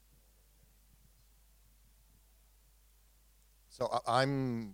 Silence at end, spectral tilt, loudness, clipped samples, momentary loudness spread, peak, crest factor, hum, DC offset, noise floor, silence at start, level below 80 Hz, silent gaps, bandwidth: 0 s; -5.5 dB/octave; -33 LUFS; under 0.1%; 11 LU; -14 dBFS; 26 dB; none; under 0.1%; -66 dBFS; 3.7 s; -66 dBFS; none; 19 kHz